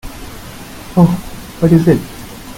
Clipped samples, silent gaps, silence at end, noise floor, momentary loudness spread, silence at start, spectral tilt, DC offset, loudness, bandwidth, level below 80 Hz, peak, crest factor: under 0.1%; none; 0 s; -31 dBFS; 20 LU; 0.05 s; -7.5 dB/octave; under 0.1%; -13 LUFS; 16.5 kHz; -34 dBFS; 0 dBFS; 16 dB